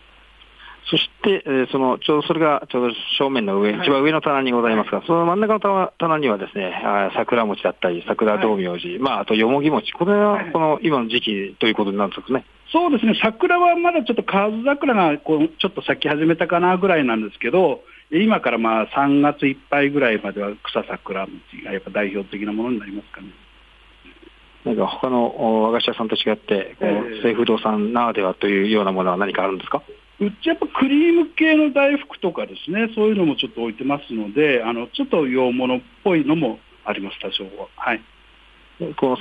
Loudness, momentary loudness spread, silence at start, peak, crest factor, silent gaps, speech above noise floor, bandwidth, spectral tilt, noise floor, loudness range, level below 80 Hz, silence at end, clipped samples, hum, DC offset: -20 LUFS; 9 LU; 0.6 s; -4 dBFS; 16 dB; none; 30 dB; 5 kHz; -7.5 dB/octave; -50 dBFS; 5 LU; -56 dBFS; 0 s; under 0.1%; none; under 0.1%